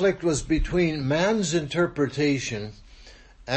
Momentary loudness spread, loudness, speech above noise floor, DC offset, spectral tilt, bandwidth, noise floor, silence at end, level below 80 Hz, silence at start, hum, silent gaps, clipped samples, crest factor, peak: 10 LU; -25 LUFS; 25 dB; under 0.1%; -5 dB/octave; 8.8 kHz; -48 dBFS; 0 s; -38 dBFS; 0 s; none; none; under 0.1%; 14 dB; -10 dBFS